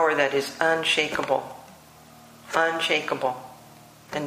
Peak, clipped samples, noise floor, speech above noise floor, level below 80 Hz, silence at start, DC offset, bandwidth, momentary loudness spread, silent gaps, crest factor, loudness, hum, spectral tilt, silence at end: -6 dBFS; under 0.1%; -49 dBFS; 25 dB; -64 dBFS; 0 s; under 0.1%; 15.5 kHz; 17 LU; none; 20 dB; -24 LUFS; none; -3 dB/octave; 0 s